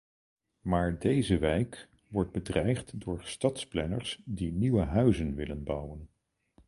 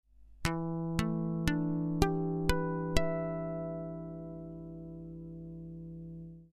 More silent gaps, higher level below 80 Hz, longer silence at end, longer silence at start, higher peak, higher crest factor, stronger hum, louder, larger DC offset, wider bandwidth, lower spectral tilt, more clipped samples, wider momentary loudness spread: neither; about the same, -44 dBFS vs -44 dBFS; first, 0.6 s vs 0.05 s; first, 0.65 s vs 0.2 s; second, -12 dBFS vs -8 dBFS; second, 20 dB vs 26 dB; second, none vs 50 Hz at -60 dBFS; first, -31 LUFS vs -35 LUFS; neither; first, 11.5 kHz vs 10 kHz; about the same, -6.5 dB/octave vs -6.5 dB/octave; neither; second, 11 LU vs 15 LU